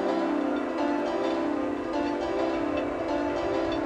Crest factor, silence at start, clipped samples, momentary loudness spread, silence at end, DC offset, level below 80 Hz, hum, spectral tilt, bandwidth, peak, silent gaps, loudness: 12 dB; 0 s; under 0.1%; 2 LU; 0 s; under 0.1%; -52 dBFS; none; -6 dB/octave; 9.4 kHz; -14 dBFS; none; -28 LUFS